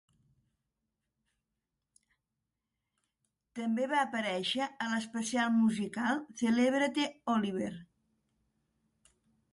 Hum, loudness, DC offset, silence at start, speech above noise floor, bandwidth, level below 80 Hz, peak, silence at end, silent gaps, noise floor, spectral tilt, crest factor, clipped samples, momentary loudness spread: none; -32 LUFS; under 0.1%; 3.55 s; 56 dB; 11.5 kHz; -76 dBFS; -18 dBFS; 1.7 s; none; -87 dBFS; -4.5 dB/octave; 18 dB; under 0.1%; 9 LU